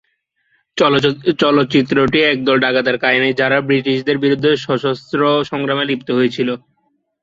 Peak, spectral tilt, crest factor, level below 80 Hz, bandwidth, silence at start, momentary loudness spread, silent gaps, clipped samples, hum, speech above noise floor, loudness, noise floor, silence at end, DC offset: 0 dBFS; -6 dB/octave; 16 dB; -52 dBFS; 7.6 kHz; 0.75 s; 5 LU; none; under 0.1%; none; 51 dB; -15 LUFS; -65 dBFS; 0.65 s; under 0.1%